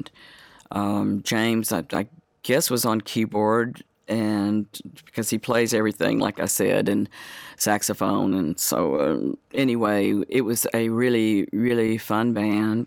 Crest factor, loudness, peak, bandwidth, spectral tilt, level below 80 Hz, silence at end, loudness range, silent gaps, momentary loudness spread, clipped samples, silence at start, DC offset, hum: 18 dB; -23 LUFS; -6 dBFS; 19 kHz; -4.5 dB/octave; -64 dBFS; 0 s; 2 LU; none; 8 LU; under 0.1%; 0 s; under 0.1%; none